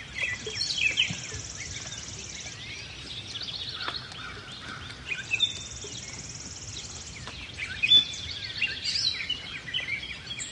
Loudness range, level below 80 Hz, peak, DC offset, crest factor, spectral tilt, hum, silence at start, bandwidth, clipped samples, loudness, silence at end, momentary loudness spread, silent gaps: 10 LU; -54 dBFS; -10 dBFS; under 0.1%; 22 dB; -1 dB/octave; none; 0 s; 11.5 kHz; under 0.1%; -29 LUFS; 0 s; 14 LU; none